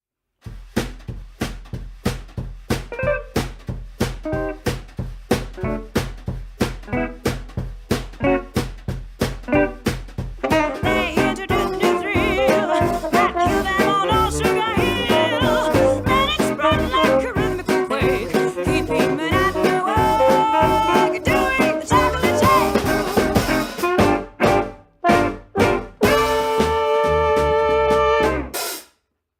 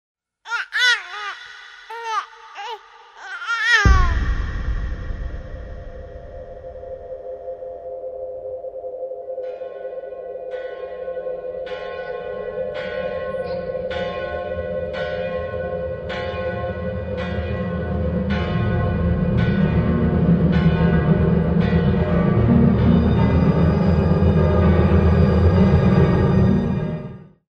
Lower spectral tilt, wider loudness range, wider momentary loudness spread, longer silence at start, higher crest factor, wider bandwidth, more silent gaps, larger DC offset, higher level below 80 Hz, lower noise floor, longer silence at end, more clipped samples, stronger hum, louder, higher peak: second, -5 dB/octave vs -7.5 dB/octave; second, 9 LU vs 15 LU; second, 13 LU vs 18 LU; about the same, 0.45 s vs 0.45 s; about the same, 16 dB vs 18 dB; first, 19 kHz vs 7.6 kHz; neither; neither; second, -34 dBFS vs -28 dBFS; first, -66 dBFS vs -42 dBFS; first, 0.55 s vs 0.3 s; neither; neither; about the same, -19 LUFS vs -20 LUFS; about the same, -2 dBFS vs -2 dBFS